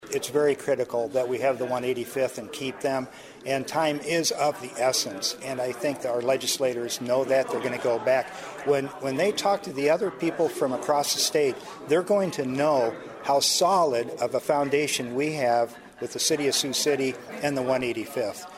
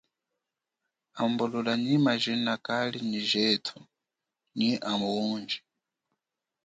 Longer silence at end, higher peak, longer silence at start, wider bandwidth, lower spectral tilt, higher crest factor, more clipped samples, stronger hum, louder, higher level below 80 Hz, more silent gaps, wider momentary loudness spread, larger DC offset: second, 0 s vs 1.1 s; first, -8 dBFS vs -12 dBFS; second, 0 s vs 1.15 s; first, 16 kHz vs 9.2 kHz; second, -3 dB/octave vs -5 dB/octave; about the same, 18 dB vs 18 dB; neither; neither; about the same, -26 LUFS vs -28 LUFS; first, -68 dBFS vs -74 dBFS; neither; about the same, 7 LU vs 9 LU; neither